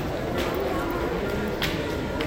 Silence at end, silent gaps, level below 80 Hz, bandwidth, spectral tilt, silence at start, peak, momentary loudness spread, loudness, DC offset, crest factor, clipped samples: 0 s; none; -38 dBFS; 17 kHz; -5.5 dB/octave; 0 s; -10 dBFS; 2 LU; -27 LUFS; under 0.1%; 16 dB; under 0.1%